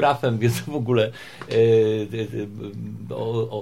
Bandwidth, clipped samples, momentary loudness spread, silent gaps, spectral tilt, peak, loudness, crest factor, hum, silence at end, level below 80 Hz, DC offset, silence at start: 16 kHz; under 0.1%; 16 LU; none; -6.5 dB/octave; -6 dBFS; -23 LUFS; 16 dB; none; 0 s; -58 dBFS; 0.3%; 0 s